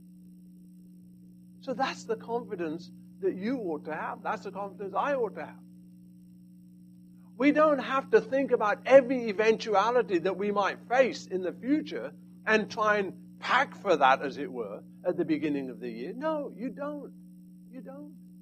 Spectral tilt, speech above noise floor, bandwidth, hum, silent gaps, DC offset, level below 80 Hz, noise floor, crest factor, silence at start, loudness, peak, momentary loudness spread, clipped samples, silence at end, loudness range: -5.5 dB/octave; 24 dB; 11.5 kHz; 60 Hz at -50 dBFS; none; under 0.1%; -76 dBFS; -52 dBFS; 24 dB; 0.05 s; -29 LUFS; -6 dBFS; 16 LU; under 0.1%; 0 s; 10 LU